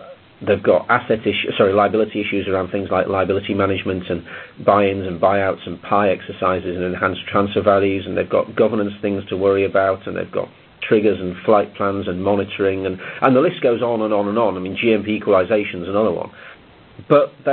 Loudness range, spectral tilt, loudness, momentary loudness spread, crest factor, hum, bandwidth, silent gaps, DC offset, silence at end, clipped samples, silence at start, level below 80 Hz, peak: 2 LU; -10 dB/octave; -18 LUFS; 8 LU; 18 dB; none; 4.4 kHz; none; under 0.1%; 0 s; under 0.1%; 0 s; -46 dBFS; 0 dBFS